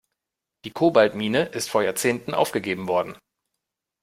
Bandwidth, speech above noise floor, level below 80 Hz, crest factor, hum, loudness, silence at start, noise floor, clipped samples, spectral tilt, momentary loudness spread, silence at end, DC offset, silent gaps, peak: 16 kHz; 63 dB; -64 dBFS; 22 dB; none; -23 LUFS; 0.65 s; -85 dBFS; under 0.1%; -4.5 dB/octave; 10 LU; 0.85 s; under 0.1%; none; -2 dBFS